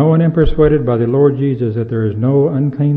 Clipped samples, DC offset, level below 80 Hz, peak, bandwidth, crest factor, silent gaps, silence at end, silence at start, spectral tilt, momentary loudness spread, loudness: under 0.1%; under 0.1%; -26 dBFS; 0 dBFS; 4 kHz; 12 dB; none; 0 s; 0 s; -12 dB/octave; 6 LU; -14 LUFS